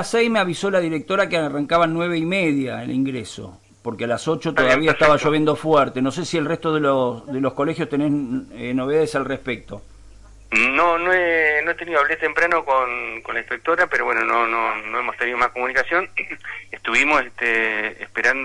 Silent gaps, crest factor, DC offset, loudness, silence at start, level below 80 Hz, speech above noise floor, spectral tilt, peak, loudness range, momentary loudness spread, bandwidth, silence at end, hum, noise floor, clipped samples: none; 16 dB; under 0.1%; -20 LUFS; 0 s; -50 dBFS; 23 dB; -5 dB/octave; -4 dBFS; 4 LU; 10 LU; 11.5 kHz; 0 s; none; -44 dBFS; under 0.1%